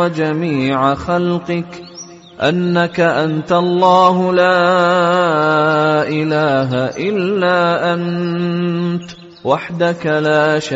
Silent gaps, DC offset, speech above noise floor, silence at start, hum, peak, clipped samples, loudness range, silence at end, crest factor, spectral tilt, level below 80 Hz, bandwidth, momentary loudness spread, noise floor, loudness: none; under 0.1%; 21 dB; 0 s; none; -2 dBFS; under 0.1%; 4 LU; 0 s; 14 dB; -4.5 dB/octave; -52 dBFS; 8 kHz; 9 LU; -35 dBFS; -15 LUFS